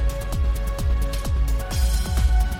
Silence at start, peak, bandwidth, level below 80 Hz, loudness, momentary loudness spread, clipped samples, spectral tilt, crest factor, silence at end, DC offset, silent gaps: 0 s; -8 dBFS; 16 kHz; -22 dBFS; -24 LUFS; 4 LU; under 0.1%; -5 dB/octave; 12 dB; 0 s; under 0.1%; none